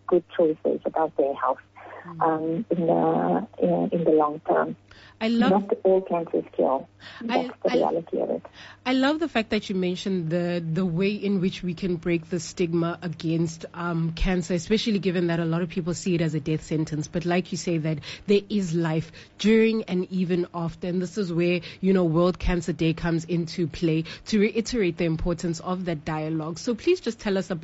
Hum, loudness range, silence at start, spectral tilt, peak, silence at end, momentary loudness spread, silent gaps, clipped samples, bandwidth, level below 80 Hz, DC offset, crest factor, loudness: none; 3 LU; 0.1 s; -6 dB/octave; -10 dBFS; 0 s; 7 LU; none; under 0.1%; 8 kHz; -44 dBFS; under 0.1%; 16 dB; -25 LUFS